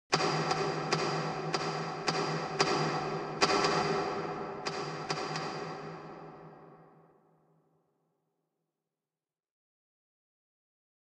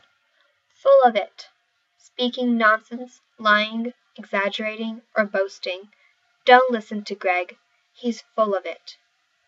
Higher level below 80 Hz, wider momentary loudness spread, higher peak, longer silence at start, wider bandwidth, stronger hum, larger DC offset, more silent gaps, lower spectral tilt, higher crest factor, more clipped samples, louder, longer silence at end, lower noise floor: first, -70 dBFS vs -90 dBFS; second, 15 LU vs 19 LU; second, -10 dBFS vs 0 dBFS; second, 0.1 s vs 0.85 s; first, 10.5 kHz vs 7.8 kHz; neither; neither; neither; about the same, -4 dB/octave vs -4.5 dB/octave; about the same, 26 dB vs 22 dB; neither; second, -32 LUFS vs -21 LUFS; first, 4.25 s vs 0.55 s; first, under -90 dBFS vs -68 dBFS